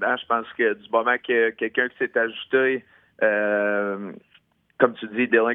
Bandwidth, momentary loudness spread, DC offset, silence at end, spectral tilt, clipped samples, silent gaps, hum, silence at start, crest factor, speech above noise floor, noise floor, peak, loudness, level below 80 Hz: 3.9 kHz; 5 LU; under 0.1%; 0 s; -8 dB/octave; under 0.1%; none; none; 0 s; 22 dB; 38 dB; -61 dBFS; -2 dBFS; -23 LUFS; -72 dBFS